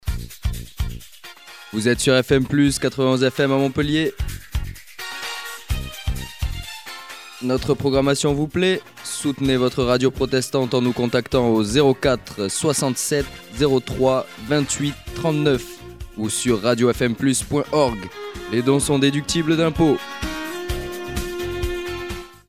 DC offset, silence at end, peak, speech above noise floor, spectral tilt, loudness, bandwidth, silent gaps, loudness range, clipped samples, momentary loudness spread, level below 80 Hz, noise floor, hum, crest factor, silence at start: 0.2%; 0.2 s; -4 dBFS; 23 dB; -5 dB/octave; -21 LUFS; 16 kHz; none; 5 LU; under 0.1%; 13 LU; -36 dBFS; -42 dBFS; none; 18 dB; 0.05 s